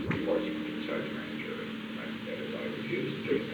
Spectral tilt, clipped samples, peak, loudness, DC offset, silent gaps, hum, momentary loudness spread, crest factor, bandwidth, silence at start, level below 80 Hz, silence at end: -7 dB/octave; under 0.1%; -18 dBFS; -35 LUFS; under 0.1%; none; none; 7 LU; 18 dB; over 20 kHz; 0 s; -64 dBFS; 0 s